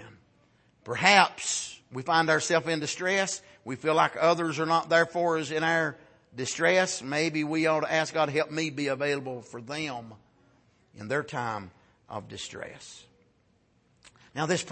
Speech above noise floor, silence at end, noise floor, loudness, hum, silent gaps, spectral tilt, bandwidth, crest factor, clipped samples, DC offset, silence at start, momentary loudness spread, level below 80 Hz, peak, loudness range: 40 dB; 0 s; -67 dBFS; -27 LUFS; none; none; -3.5 dB/octave; 8.8 kHz; 24 dB; under 0.1%; under 0.1%; 0 s; 16 LU; -70 dBFS; -4 dBFS; 12 LU